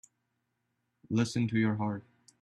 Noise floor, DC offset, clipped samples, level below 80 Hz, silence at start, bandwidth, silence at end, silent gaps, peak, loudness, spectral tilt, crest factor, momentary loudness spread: -81 dBFS; under 0.1%; under 0.1%; -68 dBFS; 1.1 s; 11.5 kHz; 0.4 s; none; -16 dBFS; -31 LUFS; -6.5 dB/octave; 16 dB; 7 LU